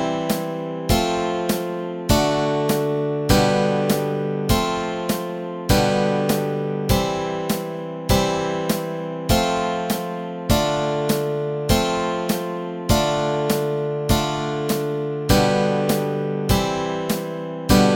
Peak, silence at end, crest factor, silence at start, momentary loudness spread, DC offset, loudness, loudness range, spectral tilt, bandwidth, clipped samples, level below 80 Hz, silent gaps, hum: 0 dBFS; 0 s; 20 dB; 0 s; 7 LU; under 0.1%; -21 LUFS; 2 LU; -5 dB/octave; 17 kHz; under 0.1%; -34 dBFS; none; none